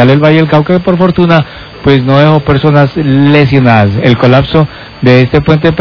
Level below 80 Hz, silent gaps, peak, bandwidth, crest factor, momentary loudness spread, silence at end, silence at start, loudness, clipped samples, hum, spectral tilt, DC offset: -30 dBFS; none; 0 dBFS; 5.4 kHz; 6 dB; 4 LU; 0 s; 0 s; -7 LUFS; 9%; none; -9 dB/octave; under 0.1%